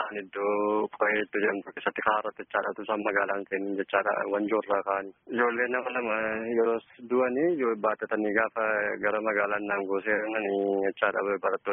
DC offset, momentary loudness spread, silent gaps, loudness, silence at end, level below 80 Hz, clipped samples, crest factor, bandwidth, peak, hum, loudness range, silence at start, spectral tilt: under 0.1%; 5 LU; none; -28 LUFS; 0 s; -70 dBFS; under 0.1%; 20 dB; 3.8 kHz; -8 dBFS; none; 1 LU; 0 s; 1 dB/octave